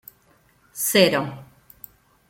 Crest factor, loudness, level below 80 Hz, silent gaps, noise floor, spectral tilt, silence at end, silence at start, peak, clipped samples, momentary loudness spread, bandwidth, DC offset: 24 dB; -19 LUFS; -62 dBFS; none; -60 dBFS; -3.5 dB/octave; 0.85 s; 0.75 s; -2 dBFS; under 0.1%; 23 LU; 16.5 kHz; under 0.1%